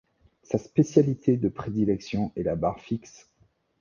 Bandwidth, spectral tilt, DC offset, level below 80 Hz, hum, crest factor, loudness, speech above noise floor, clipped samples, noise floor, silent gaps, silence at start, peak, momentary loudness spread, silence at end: 7.4 kHz; -8 dB/octave; under 0.1%; -52 dBFS; none; 22 dB; -26 LUFS; 41 dB; under 0.1%; -66 dBFS; none; 0.5 s; -6 dBFS; 10 LU; 0.85 s